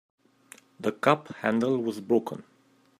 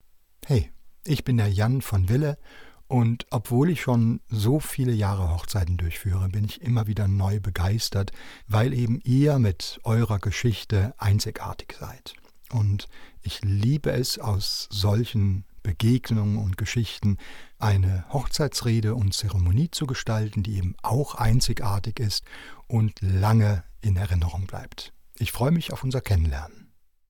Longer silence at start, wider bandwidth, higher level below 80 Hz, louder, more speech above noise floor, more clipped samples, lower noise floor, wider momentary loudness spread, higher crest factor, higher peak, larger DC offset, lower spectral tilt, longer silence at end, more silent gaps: first, 0.8 s vs 0.45 s; second, 15.5 kHz vs 18.5 kHz; second, -72 dBFS vs -40 dBFS; about the same, -27 LUFS vs -25 LUFS; first, 28 dB vs 22 dB; neither; first, -55 dBFS vs -46 dBFS; about the same, 10 LU vs 11 LU; first, 24 dB vs 16 dB; first, -4 dBFS vs -8 dBFS; neither; about the same, -6.5 dB/octave vs -6 dB/octave; about the same, 0.6 s vs 0.5 s; neither